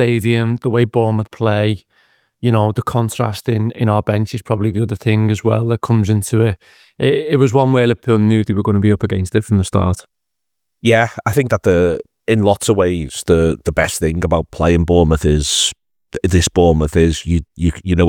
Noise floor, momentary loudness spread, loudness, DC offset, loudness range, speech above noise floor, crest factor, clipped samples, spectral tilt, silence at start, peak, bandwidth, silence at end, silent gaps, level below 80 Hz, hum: -79 dBFS; 6 LU; -15 LUFS; under 0.1%; 3 LU; 65 dB; 14 dB; under 0.1%; -6 dB/octave; 0 s; 0 dBFS; 16.5 kHz; 0 s; none; -34 dBFS; none